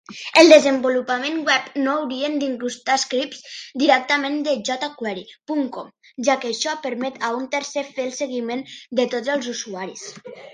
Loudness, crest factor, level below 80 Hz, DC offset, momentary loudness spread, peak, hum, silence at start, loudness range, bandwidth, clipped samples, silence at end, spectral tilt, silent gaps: -20 LUFS; 20 dB; -72 dBFS; under 0.1%; 14 LU; 0 dBFS; none; 0.1 s; 7 LU; 11 kHz; under 0.1%; 0 s; -2.5 dB/octave; none